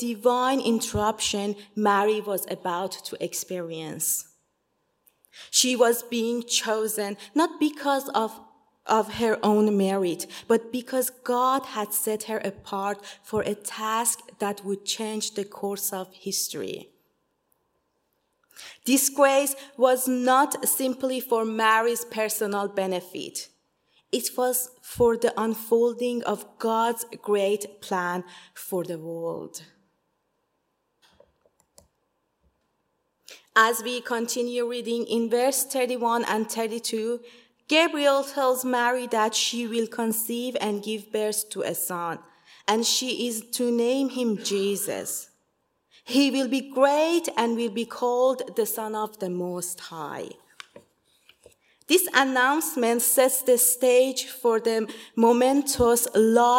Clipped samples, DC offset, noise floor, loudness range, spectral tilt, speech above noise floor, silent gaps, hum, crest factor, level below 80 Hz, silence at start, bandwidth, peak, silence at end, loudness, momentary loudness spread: under 0.1%; under 0.1%; -75 dBFS; 8 LU; -2.5 dB/octave; 50 dB; none; none; 24 dB; -62 dBFS; 0 s; 16.5 kHz; -2 dBFS; 0 s; -25 LUFS; 12 LU